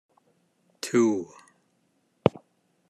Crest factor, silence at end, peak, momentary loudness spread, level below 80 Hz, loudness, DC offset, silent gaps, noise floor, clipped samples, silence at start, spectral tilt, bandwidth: 28 dB; 0.6 s; -2 dBFS; 14 LU; -68 dBFS; -26 LUFS; under 0.1%; none; -70 dBFS; under 0.1%; 0.85 s; -6 dB/octave; 13 kHz